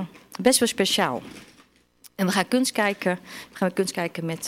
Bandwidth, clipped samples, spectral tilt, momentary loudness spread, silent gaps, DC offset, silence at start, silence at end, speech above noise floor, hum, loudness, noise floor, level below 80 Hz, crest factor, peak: 16.5 kHz; under 0.1%; -3.5 dB/octave; 15 LU; none; under 0.1%; 0 s; 0 s; 34 dB; none; -24 LUFS; -58 dBFS; -64 dBFS; 20 dB; -6 dBFS